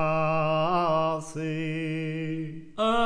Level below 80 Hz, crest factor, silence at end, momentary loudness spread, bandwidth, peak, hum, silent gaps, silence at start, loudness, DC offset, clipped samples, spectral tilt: -52 dBFS; 14 dB; 0 s; 8 LU; 10.5 kHz; -14 dBFS; none; none; 0 s; -28 LUFS; under 0.1%; under 0.1%; -6.5 dB/octave